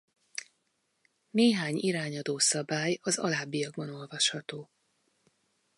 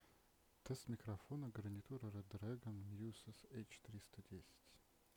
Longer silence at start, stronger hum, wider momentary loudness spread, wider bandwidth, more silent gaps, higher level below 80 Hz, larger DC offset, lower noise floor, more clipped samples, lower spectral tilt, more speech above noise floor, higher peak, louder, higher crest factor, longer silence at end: first, 0.35 s vs 0 s; neither; first, 16 LU vs 10 LU; second, 11.5 kHz vs over 20 kHz; neither; second, -82 dBFS vs -76 dBFS; neither; about the same, -77 dBFS vs -75 dBFS; neither; second, -3 dB/octave vs -6.5 dB/octave; first, 47 dB vs 23 dB; first, -12 dBFS vs -36 dBFS; first, -29 LUFS vs -53 LUFS; about the same, 20 dB vs 18 dB; first, 1.15 s vs 0.05 s